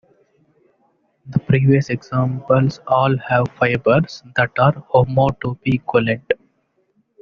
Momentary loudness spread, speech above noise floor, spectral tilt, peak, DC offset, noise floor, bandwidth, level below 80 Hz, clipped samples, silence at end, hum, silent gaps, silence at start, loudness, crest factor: 8 LU; 48 dB; -6.5 dB/octave; -2 dBFS; under 0.1%; -65 dBFS; 6.8 kHz; -48 dBFS; under 0.1%; 0.85 s; none; none; 1.25 s; -18 LUFS; 16 dB